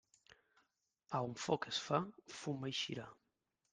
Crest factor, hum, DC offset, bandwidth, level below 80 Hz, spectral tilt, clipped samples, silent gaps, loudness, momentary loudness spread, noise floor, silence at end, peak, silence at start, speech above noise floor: 24 dB; none; under 0.1%; 10 kHz; -80 dBFS; -4.5 dB/octave; under 0.1%; none; -41 LUFS; 11 LU; -86 dBFS; 0.6 s; -20 dBFS; 1.1 s; 44 dB